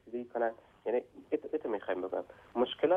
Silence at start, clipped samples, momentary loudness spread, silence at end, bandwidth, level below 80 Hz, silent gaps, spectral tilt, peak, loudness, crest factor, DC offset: 0.05 s; under 0.1%; 6 LU; 0 s; 4 kHz; -72 dBFS; none; -6.5 dB/octave; -16 dBFS; -36 LUFS; 18 dB; under 0.1%